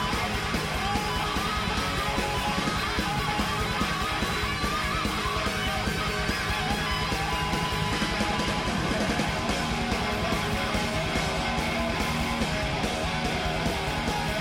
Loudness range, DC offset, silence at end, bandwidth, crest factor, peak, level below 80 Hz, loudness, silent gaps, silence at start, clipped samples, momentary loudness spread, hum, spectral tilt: 0 LU; under 0.1%; 0 s; 16.5 kHz; 14 dB; -14 dBFS; -38 dBFS; -27 LUFS; none; 0 s; under 0.1%; 1 LU; none; -4 dB/octave